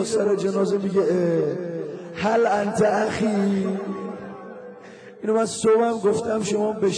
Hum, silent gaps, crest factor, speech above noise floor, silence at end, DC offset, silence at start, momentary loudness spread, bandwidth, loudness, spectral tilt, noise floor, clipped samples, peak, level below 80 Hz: none; none; 12 dB; 21 dB; 0 s; under 0.1%; 0 s; 17 LU; 10.5 kHz; -22 LUFS; -5.5 dB/octave; -42 dBFS; under 0.1%; -10 dBFS; -62 dBFS